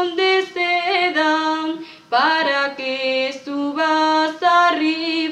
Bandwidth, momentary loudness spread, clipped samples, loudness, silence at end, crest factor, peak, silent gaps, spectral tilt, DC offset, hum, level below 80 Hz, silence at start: 9.6 kHz; 8 LU; under 0.1%; -18 LUFS; 0 s; 14 dB; -6 dBFS; none; -2.5 dB/octave; under 0.1%; none; -72 dBFS; 0 s